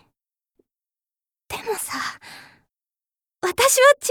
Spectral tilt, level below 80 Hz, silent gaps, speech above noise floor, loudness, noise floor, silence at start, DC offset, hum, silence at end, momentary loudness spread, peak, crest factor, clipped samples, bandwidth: -0.5 dB/octave; -60 dBFS; none; over 71 dB; -20 LUFS; under -90 dBFS; 1.5 s; under 0.1%; none; 0 s; 22 LU; -4 dBFS; 20 dB; under 0.1%; over 20 kHz